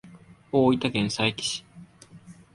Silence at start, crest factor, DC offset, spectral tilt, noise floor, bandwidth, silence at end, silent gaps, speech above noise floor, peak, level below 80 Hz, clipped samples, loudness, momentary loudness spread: 0.05 s; 20 dB; under 0.1%; -4.5 dB/octave; -50 dBFS; 11.5 kHz; 0.2 s; none; 26 dB; -8 dBFS; -60 dBFS; under 0.1%; -25 LUFS; 8 LU